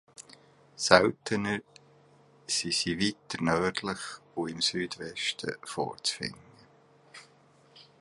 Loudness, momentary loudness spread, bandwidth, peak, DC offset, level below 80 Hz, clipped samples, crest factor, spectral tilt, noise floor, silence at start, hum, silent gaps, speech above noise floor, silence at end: -29 LUFS; 19 LU; 11.5 kHz; -2 dBFS; under 0.1%; -62 dBFS; under 0.1%; 30 dB; -3 dB/octave; -61 dBFS; 0.2 s; none; none; 31 dB; 0.2 s